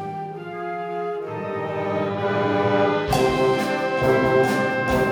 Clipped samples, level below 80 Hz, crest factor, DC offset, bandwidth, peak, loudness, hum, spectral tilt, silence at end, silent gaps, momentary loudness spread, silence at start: under 0.1%; -44 dBFS; 16 dB; under 0.1%; 20 kHz; -6 dBFS; -22 LUFS; none; -6 dB/octave; 0 s; none; 11 LU; 0 s